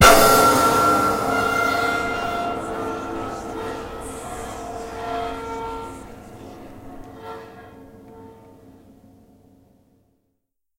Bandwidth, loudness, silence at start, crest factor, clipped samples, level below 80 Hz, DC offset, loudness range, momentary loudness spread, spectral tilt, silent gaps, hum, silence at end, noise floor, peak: 16 kHz; -21 LUFS; 0 s; 22 dB; under 0.1%; -40 dBFS; under 0.1%; 23 LU; 25 LU; -3.5 dB/octave; none; none; 2.05 s; -75 dBFS; 0 dBFS